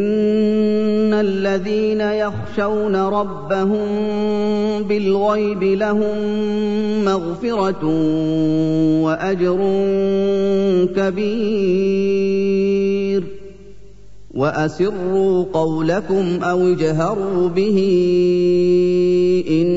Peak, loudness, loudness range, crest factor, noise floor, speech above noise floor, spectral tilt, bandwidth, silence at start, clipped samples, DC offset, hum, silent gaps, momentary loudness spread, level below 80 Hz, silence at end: -6 dBFS; -18 LUFS; 3 LU; 12 dB; -43 dBFS; 26 dB; -7.5 dB/octave; 7.8 kHz; 0 s; under 0.1%; 2%; 50 Hz at -45 dBFS; none; 5 LU; -46 dBFS; 0 s